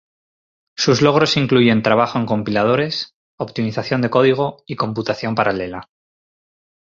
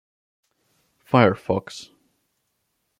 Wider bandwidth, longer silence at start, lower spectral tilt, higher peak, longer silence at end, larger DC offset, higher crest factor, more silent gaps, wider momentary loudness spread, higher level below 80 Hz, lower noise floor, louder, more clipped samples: second, 7.6 kHz vs 13 kHz; second, 0.8 s vs 1.1 s; second, -5.5 dB/octave vs -7 dB/octave; about the same, -2 dBFS vs -2 dBFS; about the same, 1.05 s vs 1.15 s; neither; second, 18 dB vs 24 dB; first, 3.14-3.38 s vs none; second, 13 LU vs 21 LU; first, -54 dBFS vs -64 dBFS; first, under -90 dBFS vs -74 dBFS; first, -17 LUFS vs -21 LUFS; neither